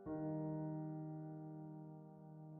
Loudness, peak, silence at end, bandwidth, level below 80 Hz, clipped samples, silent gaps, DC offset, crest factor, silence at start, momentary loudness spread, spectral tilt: -48 LUFS; -34 dBFS; 0 s; 2.2 kHz; -78 dBFS; under 0.1%; none; under 0.1%; 12 dB; 0 s; 13 LU; -9.5 dB/octave